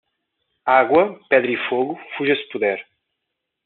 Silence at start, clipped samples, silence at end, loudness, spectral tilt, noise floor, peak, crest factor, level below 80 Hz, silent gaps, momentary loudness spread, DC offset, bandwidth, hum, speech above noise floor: 0.65 s; under 0.1%; 0.85 s; -19 LUFS; -2 dB/octave; -79 dBFS; -2 dBFS; 20 dB; -68 dBFS; none; 10 LU; under 0.1%; 4.3 kHz; none; 61 dB